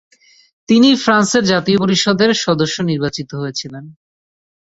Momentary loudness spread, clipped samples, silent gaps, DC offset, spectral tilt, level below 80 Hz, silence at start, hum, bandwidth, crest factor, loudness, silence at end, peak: 13 LU; under 0.1%; none; under 0.1%; -4.5 dB/octave; -54 dBFS; 0.7 s; none; 8 kHz; 14 dB; -14 LUFS; 0.75 s; -2 dBFS